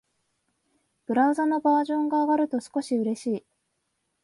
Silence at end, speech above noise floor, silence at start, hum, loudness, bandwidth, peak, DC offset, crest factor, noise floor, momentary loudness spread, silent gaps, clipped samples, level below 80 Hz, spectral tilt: 0.85 s; 53 dB; 1.1 s; none; -25 LUFS; 11.5 kHz; -12 dBFS; under 0.1%; 16 dB; -77 dBFS; 8 LU; none; under 0.1%; -76 dBFS; -5.5 dB/octave